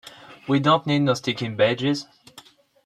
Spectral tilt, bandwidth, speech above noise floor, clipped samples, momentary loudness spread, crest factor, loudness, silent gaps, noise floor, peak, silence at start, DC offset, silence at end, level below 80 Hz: -6 dB/octave; 12.5 kHz; 29 dB; under 0.1%; 20 LU; 18 dB; -22 LUFS; none; -51 dBFS; -6 dBFS; 0.05 s; under 0.1%; 0.45 s; -64 dBFS